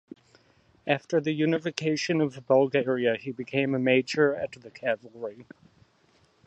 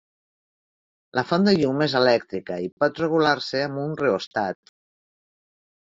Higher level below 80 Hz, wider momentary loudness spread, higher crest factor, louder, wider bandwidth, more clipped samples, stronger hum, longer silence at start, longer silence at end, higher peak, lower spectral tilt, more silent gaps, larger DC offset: second, -72 dBFS vs -64 dBFS; about the same, 12 LU vs 10 LU; about the same, 20 dB vs 18 dB; second, -26 LUFS vs -23 LUFS; first, 8.6 kHz vs 7.6 kHz; neither; neither; second, 0.85 s vs 1.15 s; second, 1.05 s vs 1.3 s; about the same, -6 dBFS vs -6 dBFS; first, -5.5 dB/octave vs -4 dB/octave; second, none vs 2.72-2.77 s, 4.27-4.31 s; neither